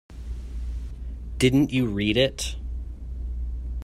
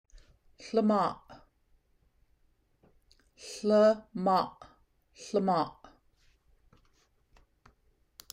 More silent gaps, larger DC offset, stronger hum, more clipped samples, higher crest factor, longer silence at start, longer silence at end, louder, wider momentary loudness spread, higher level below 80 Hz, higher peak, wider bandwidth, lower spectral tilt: neither; neither; neither; neither; about the same, 20 dB vs 20 dB; second, 0.1 s vs 0.6 s; second, 0 s vs 2.65 s; first, -26 LUFS vs -29 LUFS; second, 16 LU vs 24 LU; first, -34 dBFS vs -66 dBFS; first, -6 dBFS vs -14 dBFS; second, 13.5 kHz vs 16 kHz; about the same, -5.5 dB/octave vs -6 dB/octave